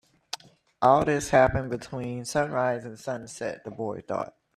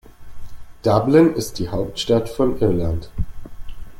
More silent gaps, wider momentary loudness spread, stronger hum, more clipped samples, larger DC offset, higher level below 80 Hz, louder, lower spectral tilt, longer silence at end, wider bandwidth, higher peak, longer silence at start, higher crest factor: neither; about the same, 14 LU vs 14 LU; neither; neither; neither; second, -50 dBFS vs -34 dBFS; second, -27 LUFS vs -19 LUFS; about the same, -5.5 dB/octave vs -6.5 dB/octave; first, 0.3 s vs 0 s; second, 14 kHz vs 16.5 kHz; second, -6 dBFS vs -2 dBFS; first, 0.35 s vs 0.2 s; about the same, 20 dB vs 18 dB